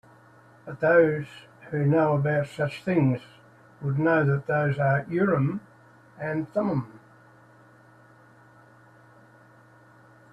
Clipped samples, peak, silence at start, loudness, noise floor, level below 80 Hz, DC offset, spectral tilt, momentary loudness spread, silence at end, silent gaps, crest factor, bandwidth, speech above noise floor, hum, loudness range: under 0.1%; -8 dBFS; 0.65 s; -25 LUFS; -54 dBFS; -64 dBFS; under 0.1%; -9 dB/octave; 15 LU; 3.35 s; none; 20 dB; 9 kHz; 30 dB; none; 10 LU